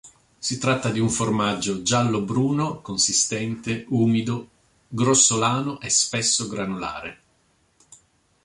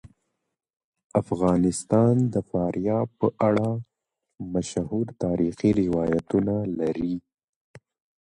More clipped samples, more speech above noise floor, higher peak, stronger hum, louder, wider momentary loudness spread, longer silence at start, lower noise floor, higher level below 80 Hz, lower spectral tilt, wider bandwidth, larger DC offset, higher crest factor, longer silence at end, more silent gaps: neither; second, 41 dB vs 48 dB; about the same, -4 dBFS vs -6 dBFS; neither; first, -22 LUFS vs -25 LUFS; first, 12 LU vs 8 LU; about the same, 0.05 s vs 0.05 s; second, -64 dBFS vs -72 dBFS; about the same, -56 dBFS vs -52 dBFS; second, -3.5 dB/octave vs -7.5 dB/octave; about the same, 11.5 kHz vs 11.5 kHz; neither; about the same, 18 dB vs 18 dB; first, 1.3 s vs 0.5 s; second, none vs 0.84-0.92 s, 1.04-1.10 s, 7.44-7.74 s